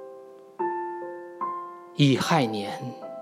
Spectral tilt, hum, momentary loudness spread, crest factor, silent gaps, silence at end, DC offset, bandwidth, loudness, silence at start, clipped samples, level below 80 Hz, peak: -6 dB/octave; none; 18 LU; 20 dB; none; 0 s; under 0.1%; 15.5 kHz; -27 LUFS; 0 s; under 0.1%; -70 dBFS; -8 dBFS